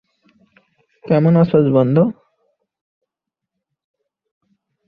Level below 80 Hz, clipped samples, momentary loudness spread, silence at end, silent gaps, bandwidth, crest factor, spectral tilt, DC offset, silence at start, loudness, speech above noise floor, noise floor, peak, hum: -58 dBFS; under 0.1%; 6 LU; 2.75 s; none; 5 kHz; 18 dB; -11.5 dB/octave; under 0.1%; 1.05 s; -15 LUFS; 70 dB; -83 dBFS; -2 dBFS; none